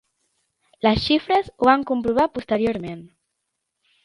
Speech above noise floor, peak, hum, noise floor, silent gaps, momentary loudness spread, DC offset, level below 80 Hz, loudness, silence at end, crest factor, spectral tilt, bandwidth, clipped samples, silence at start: 58 dB; -2 dBFS; none; -78 dBFS; none; 10 LU; under 0.1%; -46 dBFS; -21 LUFS; 1 s; 20 dB; -6.5 dB/octave; 11 kHz; under 0.1%; 0.85 s